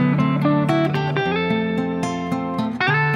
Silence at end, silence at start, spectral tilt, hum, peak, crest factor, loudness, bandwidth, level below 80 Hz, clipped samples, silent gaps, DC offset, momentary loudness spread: 0 s; 0 s; -7 dB/octave; none; -6 dBFS; 14 dB; -20 LUFS; 10.5 kHz; -54 dBFS; under 0.1%; none; under 0.1%; 6 LU